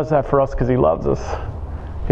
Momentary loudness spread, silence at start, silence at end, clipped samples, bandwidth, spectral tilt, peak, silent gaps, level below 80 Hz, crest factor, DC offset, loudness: 13 LU; 0 s; 0 s; under 0.1%; 7.8 kHz; -8.5 dB/octave; -2 dBFS; none; -30 dBFS; 18 dB; under 0.1%; -19 LUFS